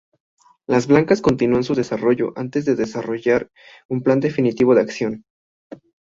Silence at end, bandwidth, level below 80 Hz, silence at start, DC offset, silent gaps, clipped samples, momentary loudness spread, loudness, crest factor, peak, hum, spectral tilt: 0.35 s; 7.6 kHz; -54 dBFS; 0.7 s; under 0.1%; 3.85-3.89 s, 5.30-5.70 s; under 0.1%; 10 LU; -19 LUFS; 18 dB; -2 dBFS; none; -7 dB/octave